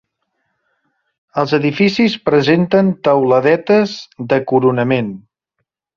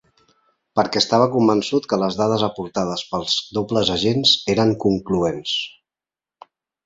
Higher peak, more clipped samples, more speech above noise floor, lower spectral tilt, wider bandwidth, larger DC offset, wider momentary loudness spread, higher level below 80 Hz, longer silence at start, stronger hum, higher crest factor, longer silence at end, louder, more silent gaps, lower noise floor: about the same, -2 dBFS vs -2 dBFS; neither; second, 60 dB vs over 71 dB; first, -7 dB/octave vs -5 dB/octave; second, 7.2 kHz vs 8 kHz; neither; about the same, 9 LU vs 8 LU; about the same, -56 dBFS vs -52 dBFS; first, 1.35 s vs 0.75 s; neither; second, 14 dB vs 20 dB; second, 0.8 s vs 1.15 s; first, -14 LUFS vs -19 LUFS; neither; second, -74 dBFS vs under -90 dBFS